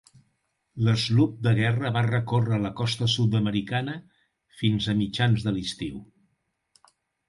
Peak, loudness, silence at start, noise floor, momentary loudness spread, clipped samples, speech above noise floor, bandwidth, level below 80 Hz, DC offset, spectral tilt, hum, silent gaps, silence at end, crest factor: -10 dBFS; -25 LUFS; 0.75 s; -75 dBFS; 11 LU; under 0.1%; 50 dB; 11.5 kHz; -54 dBFS; under 0.1%; -6 dB/octave; none; none; 1.25 s; 16 dB